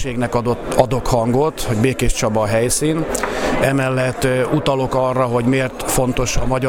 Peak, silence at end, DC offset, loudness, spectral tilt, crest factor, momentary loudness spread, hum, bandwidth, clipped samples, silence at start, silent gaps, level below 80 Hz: 0 dBFS; 0 s; under 0.1%; -18 LUFS; -5 dB/octave; 16 dB; 3 LU; none; 17.5 kHz; under 0.1%; 0 s; none; -30 dBFS